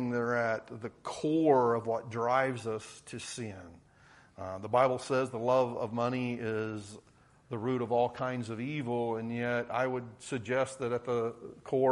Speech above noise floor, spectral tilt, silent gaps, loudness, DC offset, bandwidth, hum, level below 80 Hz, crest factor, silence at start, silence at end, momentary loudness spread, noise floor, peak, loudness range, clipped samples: 28 dB; -6 dB/octave; none; -32 LUFS; under 0.1%; 11.5 kHz; none; -70 dBFS; 20 dB; 0 s; 0 s; 14 LU; -60 dBFS; -12 dBFS; 3 LU; under 0.1%